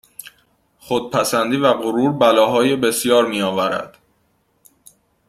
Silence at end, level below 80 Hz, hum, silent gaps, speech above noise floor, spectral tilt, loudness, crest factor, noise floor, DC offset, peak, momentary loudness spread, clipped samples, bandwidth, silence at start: 1.4 s; -60 dBFS; none; none; 47 dB; -4 dB/octave; -17 LUFS; 18 dB; -63 dBFS; under 0.1%; -2 dBFS; 11 LU; under 0.1%; 15.5 kHz; 0.25 s